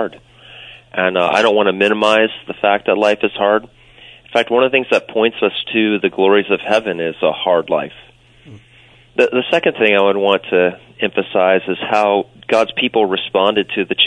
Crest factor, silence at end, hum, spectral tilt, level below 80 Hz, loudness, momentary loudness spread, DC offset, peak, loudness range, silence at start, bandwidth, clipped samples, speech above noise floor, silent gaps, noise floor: 16 dB; 0 s; none; -5 dB/octave; -58 dBFS; -15 LUFS; 6 LU; under 0.1%; 0 dBFS; 2 LU; 0 s; 10.5 kHz; under 0.1%; 32 dB; none; -47 dBFS